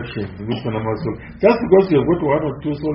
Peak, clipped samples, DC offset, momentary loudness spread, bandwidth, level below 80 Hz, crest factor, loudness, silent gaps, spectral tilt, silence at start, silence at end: -2 dBFS; under 0.1%; under 0.1%; 13 LU; 5.8 kHz; -42 dBFS; 16 dB; -18 LUFS; none; -6.5 dB/octave; 0 s; 0 s